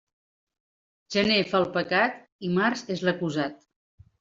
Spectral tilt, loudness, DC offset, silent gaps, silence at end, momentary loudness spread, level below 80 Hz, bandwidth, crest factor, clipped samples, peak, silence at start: -5 dB/octave; -26 LUFS; under 0.1%; 2.32-2.39 s; 0.65 s; 8 LU; -64 dBFS; 7.8 kHz; 20 dB; under 0.1%; -8 dBFS; 1.1 s